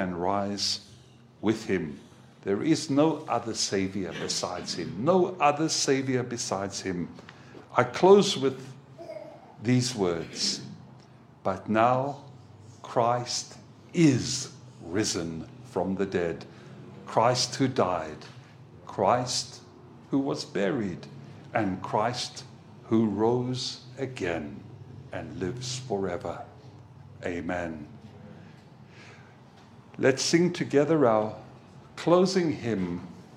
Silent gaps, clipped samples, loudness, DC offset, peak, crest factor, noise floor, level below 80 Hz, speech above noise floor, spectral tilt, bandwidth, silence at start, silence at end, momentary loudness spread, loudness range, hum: none; under 0.1%; -27 LUFS; under 0.1%; -4 dBFS; 24 dB; -53 dBFS; -64 dBFS; 26 dB; -4.5 dB/octave; 14.5 kHz; 0 s; 0 s; 22 LU; 9 LU; none